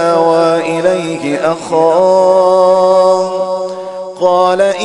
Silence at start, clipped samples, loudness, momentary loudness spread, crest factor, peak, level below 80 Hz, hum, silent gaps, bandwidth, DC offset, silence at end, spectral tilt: 0 s; under 0.1%; -11 LUFS; 9 LU; 10 dB; 0 dBFS; -58 dBFS; none; none; 11 kHz; under 0.1%; 0 s; -5 dB/octave